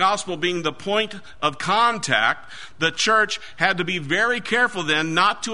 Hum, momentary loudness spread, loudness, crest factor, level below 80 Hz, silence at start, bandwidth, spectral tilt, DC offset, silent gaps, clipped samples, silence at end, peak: none; 7 LU; -21 LUFS; 20 dB; -58 dBFS; 0 s; 11 kHz; -3 dB/octave; 1%; none; under 0.1%; 0 s; -2 dBFS